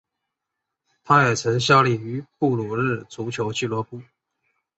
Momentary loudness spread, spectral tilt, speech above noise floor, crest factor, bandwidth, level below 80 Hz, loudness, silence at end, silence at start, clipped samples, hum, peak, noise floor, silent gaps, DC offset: 14 LU; -5 dB/octave; 61 dB; 22 dB; 8.2 kHz; -60 dBFS; -21 LUFS; 0.75 s; 1.05 s; under 0.1%; none; -2 dBFS; -83 dBFS; none; under 0.1%